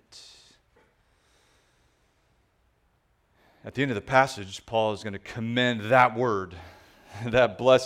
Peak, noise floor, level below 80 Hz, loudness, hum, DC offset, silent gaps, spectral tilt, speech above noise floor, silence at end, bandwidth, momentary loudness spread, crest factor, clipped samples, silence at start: -4 dBFS; -68 dBFS; -58 dBFS; -25 LUFS; none; under 0.1%; none; -5.5 dB/octave; 44 dB; 0 s; 14.5 kHz; 25 LU; 24 dB; under 0.1%; 0.15 s